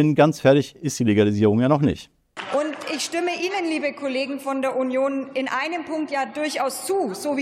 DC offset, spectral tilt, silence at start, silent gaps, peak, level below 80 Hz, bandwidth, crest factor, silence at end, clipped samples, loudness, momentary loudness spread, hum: under 0.1%; -5.5 dB/octave; 0 s; none; -4 dBFS; -58 dBFS; 16 kHz; 18 dB; 0 s; under 0.1%; -22 LUFS; 9 LU; none